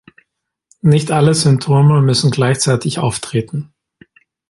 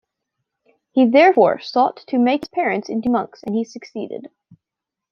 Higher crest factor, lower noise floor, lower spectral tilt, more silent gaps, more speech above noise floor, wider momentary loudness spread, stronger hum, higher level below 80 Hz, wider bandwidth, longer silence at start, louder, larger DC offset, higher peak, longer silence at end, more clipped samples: about the same, 14 dB vs 18 dB; second, -68 dBFS vs -85 dBFS; about the same, -5.5 dB/octave vs -6 dB/octave; neither; second, 55 dB vs 67 dB; second, 9 LU vs 17 LU; neither; first, -50 dBFS vs -64 dBFS; first, 11.5 kHz vs 6.8 kHz; about the same, 0.85 s vs 0.95 s; first, -14 LUFS vs -18 LUFS; neither; about the same, 0 dBFS vs -2 dBFS; about the same, 0.85 s vs 0.85 s; neither